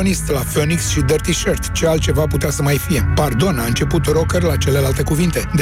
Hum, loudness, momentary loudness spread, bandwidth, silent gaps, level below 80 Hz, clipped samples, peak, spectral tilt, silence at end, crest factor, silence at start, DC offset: none; -17 LUFS; 2 LU; 16.5 kHz; none; -26 dBFS; under 0.1%; -4 dBFS; -5 dB/octave; 0 s; 12 dB; 0 s; under 0.1%